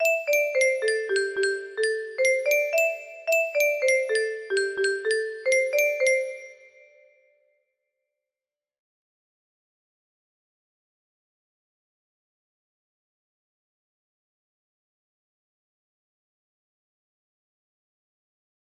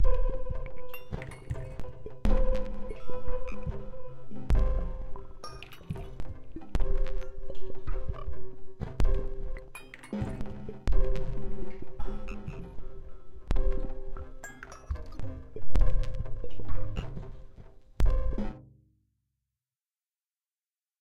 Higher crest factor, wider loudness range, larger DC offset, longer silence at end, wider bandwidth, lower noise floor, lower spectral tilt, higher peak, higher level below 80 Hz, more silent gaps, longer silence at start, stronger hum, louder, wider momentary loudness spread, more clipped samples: about the same, 18 dB vs 16 dB; about the same, 5 LU vs 4 LU; neither; first, 12.2 s vs 0 s; first, 14.5 kHz vs 7.8 kHz; about the same, under -90 dBFS vs under -90 dBFS; second, 0 dB/octave vs -7.5 dB/octave; about the same, -10 dBFS vs -10 dBFS; second, -78 dBFS vs -32 dBFS; neither; about the same, 0 s vs 0 s; neither; first, -24 LUFS vs -38 LUFS; second, 6 LU vs 15 LU; neither